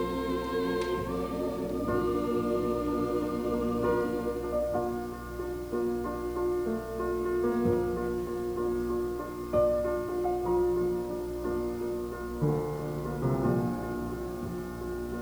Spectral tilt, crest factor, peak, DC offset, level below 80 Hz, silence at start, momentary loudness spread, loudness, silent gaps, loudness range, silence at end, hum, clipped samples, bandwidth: -7.5 dB/octave; 16 dB; -14 dBFS; under 0.1%; -46 dBFS; 0 s; 8 LU; -31 LUFS; none; 2 LU; 0 s; none; under 0.1%; over 20 kHz